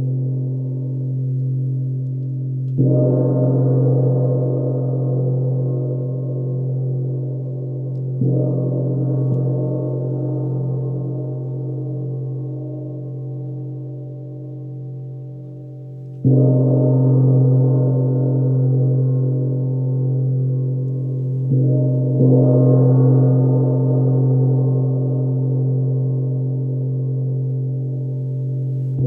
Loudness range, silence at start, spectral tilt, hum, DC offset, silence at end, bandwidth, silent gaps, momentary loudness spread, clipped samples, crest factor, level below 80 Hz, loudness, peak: 10 LU; 0 s; -15 dB/octave; none; under 0.1%; 0 s; 1.3 kHz; none; 14 LU; under 0.1%; 16 dB; -58 dBFS; -19 LUFS; -2 dBFS